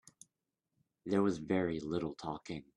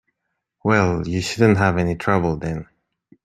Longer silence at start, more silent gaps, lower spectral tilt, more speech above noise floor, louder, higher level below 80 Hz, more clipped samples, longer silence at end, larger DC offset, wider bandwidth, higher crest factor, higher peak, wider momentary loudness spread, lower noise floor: first, 1.05 s vs 0.65 s; neither; about the same, -6.5 dB/octave vs -6.5 dB/octave; second, 53 dB vs 59 dB; second, -36 LUFS vs -20 LUFS; second, -68 dBFS vs -46 dBFS; neither; second, 0.15 s vs 0.6 s; neither; second, 11.5 kHz vs 13 kHz; about the same, 18 dB vs 18 dB; second, -20 dBFS vs -2 dBFS; about the same, 11 LU vs 10 LU; first, -88 dBFS vs -78 dBFS